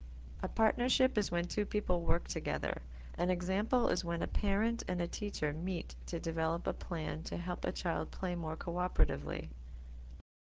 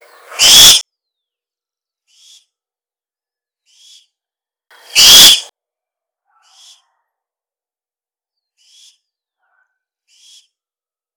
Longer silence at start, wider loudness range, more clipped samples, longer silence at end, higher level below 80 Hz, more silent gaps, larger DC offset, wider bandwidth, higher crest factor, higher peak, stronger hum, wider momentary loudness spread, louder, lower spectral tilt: second, 0 s vs 0.35 s; about the same, 3 LU vs 4 LU; second, under 0.1% vs 1%; second, 0.35 s vs 5.75 s; first, -40 dBFS vs -50 dBFS; neither; neither; second, 8 kHz vs over 20 kHz; about the same, 20 dB vs 16 dB; second, -14 dBFS vs 0 dBFS; neither; about the same, 11 LU vs 12 LU; second, -35 LUFS vs -3 LUFS; first, -5.5 dB/octave vs 2 dB/octave